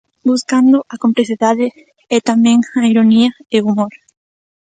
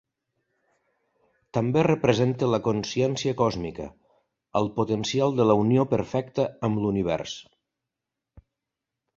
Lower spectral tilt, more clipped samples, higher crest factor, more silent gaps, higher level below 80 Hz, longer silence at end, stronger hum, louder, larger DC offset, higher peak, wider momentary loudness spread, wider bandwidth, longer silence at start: second, -5 dB/octave vs -6.5 dB/octave; neither; second, 14 dB vs 22 dB; neither; second, -60 dBFS vs -54 dBFS; second, 0.8 s vs 1.75 s; neither; first, -13 LUFS vs -25 LUFS; neither; first, 0 dBFS vs -4 dBFS; second, 7 LU vs 11 LU; first, 9.2 kHz vs 7.6 kHz; second, 0.25 s vs 1.55 s